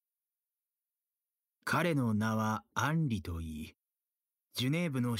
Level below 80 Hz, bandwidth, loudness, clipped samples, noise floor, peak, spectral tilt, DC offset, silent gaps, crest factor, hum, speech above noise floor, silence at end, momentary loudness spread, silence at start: -58 dBFS; 16 kHz; -34 LUFS; under 0.1%; under -90 dBFS; -18 dBFS; -6 dB/octave; under 0.1%; none; 18 dB; none; over 57 dB; 0 s; 12 LU; 1.65 s